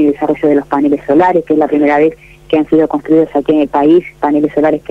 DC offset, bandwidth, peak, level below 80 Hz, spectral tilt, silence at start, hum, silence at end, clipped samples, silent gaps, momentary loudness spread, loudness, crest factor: under 0.1%; 4.7 kHz; -2 dBFS; -44 dBFS; -8 dB/octave; 0 s; none; 0.1 s; under 0.1%; none; 3 LU; -11 LUFS; 10 dB